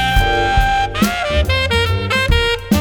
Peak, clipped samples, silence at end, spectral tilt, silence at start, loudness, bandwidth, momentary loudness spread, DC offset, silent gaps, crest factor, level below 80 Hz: -2 dBFS; under 0.1%; 0 s; -4.5 dB/octave; 0 s; -15 LUFS; over 20 kHz; 2 LU; under 0.1%; none; 14 dB; -22 dBFS